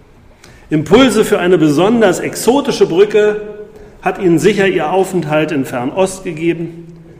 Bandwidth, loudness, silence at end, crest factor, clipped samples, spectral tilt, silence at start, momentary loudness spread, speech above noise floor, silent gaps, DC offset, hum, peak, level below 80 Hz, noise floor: 15.5 kHz; -13 LUFS; 0.1 s; 12 dB; under 0.1%; -5.5 dB/octave; 0.7 s; 10 LU; 29 dB; none; under 0.1%; none; 0 dBFS; -42 dBFS; -41 dBFS